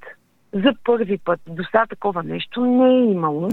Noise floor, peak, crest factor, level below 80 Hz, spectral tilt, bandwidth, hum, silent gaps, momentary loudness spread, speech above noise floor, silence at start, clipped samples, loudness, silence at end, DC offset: -44 dBFS; 0 dBFS; 18 dB; -58 dBFS; -8 dB/octave; 4.3 kHz; none; none; 10 LU; 26 dB; 0.05 s; under 0.1%; -19 LUFS; 0 s; under 0.1%